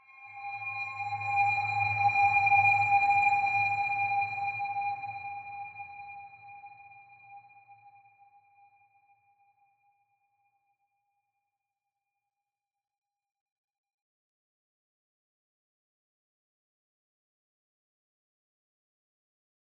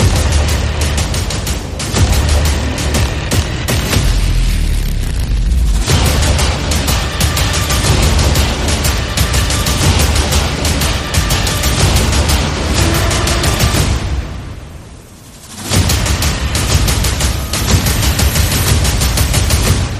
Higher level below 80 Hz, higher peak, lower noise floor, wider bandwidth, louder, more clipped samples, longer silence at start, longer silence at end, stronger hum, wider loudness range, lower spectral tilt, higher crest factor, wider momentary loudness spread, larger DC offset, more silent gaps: second, -80 dBFS vs -18 dBFS; second, -14 dBFS vs 0 dBFS; first, under -90 dBFS vs -35 dBFS; second, 7.8 kHz vs 15.5 kHz; second, -27 LUFS vs -13 LUFS; neither; first, 0.2 s vs 0 s; first, 11.8 s vs 0 s; neither; first, 21 LU vs 3 LU; about the same, -4 dB/octave vs -4 dB/octave; first, 20 dB vs 12 dB; first, 23 LU vs 6 LU; neither; neither